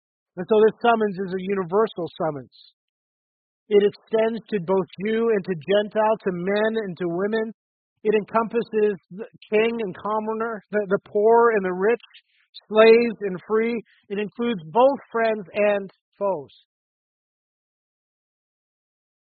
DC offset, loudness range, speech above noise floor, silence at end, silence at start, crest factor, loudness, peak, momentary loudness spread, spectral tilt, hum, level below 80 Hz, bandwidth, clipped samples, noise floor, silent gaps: under 0.1%; 5 LU; over 68 dB; 2.75 s; 0.35 s; 20 dB; -22 LUFS; -4 dBFS; 11 LU; -4.5 dB/octave; none; -68 dBFS; 4.7 kHz; under 0.1%; under -90 dBFS; 2.73-3.66 s, 7.54-7.96 s, 12.49-12.53 s, 16.01-16.12 s